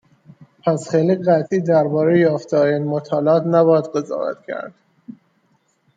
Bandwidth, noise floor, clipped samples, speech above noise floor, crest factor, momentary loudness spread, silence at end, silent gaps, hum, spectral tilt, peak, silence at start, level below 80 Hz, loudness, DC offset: 9.2 kHz; -63 dBFS; under 0.1%; 46 dB; 16 dB; 11 LU; 0.85 s; none; none; -8 dB/octave; -4 dBFS; 0.4 s; -66 dBFS; -18 LUFS; under 0.1%